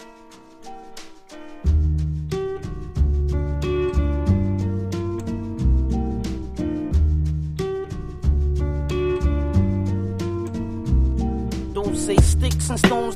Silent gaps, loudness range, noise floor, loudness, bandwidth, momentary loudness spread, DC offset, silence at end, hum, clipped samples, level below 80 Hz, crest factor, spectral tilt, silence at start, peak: none; 2 LU; -45 dBFS; -23 LUFS; 13.5 kHz; 11 LU; under 0.1%; 0 s; none; under 0.1%; -24 dBFS; 20 dB; -6.5 dB/octave; 0 s; -2 dBFS